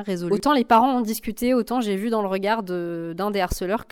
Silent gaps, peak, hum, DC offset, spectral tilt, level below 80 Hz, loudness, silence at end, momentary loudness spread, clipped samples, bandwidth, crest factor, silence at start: none; -6 dBFS; none; under 0.1%; -5.5 dB/octave; -42 dBFS; -22 LUFS; 0.1 s; 10 LU; under 0.1%; 18.5 kHz; 16 dB; 0 s